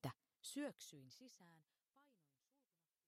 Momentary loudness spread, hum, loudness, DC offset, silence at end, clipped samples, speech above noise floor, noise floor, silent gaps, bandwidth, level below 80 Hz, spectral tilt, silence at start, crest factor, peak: 15 LU; none; -54 LUFS; under 0.1%; 1 s; under 0.1%; over 35 dB; under -90 dBFS; none; 15 kHz; under -90 dBFS; -4.5 dB/octave; 0.05 s; 22 dB; -34 dBFS